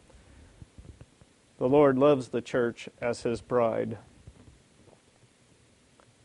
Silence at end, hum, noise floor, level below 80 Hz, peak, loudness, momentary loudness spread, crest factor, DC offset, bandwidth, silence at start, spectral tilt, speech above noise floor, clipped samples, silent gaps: 2.25 s; none; -62 dBFS; -60 dBFS; -10 dBFS; -27 LUFS; 12 LU; 20 dB; under 0.1%; 11 kHz; 0.8 s; -7 dB/octave; 36 dB; under 0.1%; none